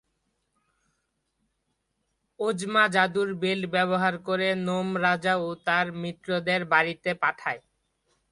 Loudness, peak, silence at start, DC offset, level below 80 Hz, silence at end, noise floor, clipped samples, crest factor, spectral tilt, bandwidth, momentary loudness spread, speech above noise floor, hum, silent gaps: -26 LUFS; -6 dBFS; 2.4 s; under 0.1%; -68 dBFS; 0.7 s; -77 dBFS; under 0.1%; 22 dB; -5 dB/octave; 11.5 kHz; 8 LU; 51 dB; none; none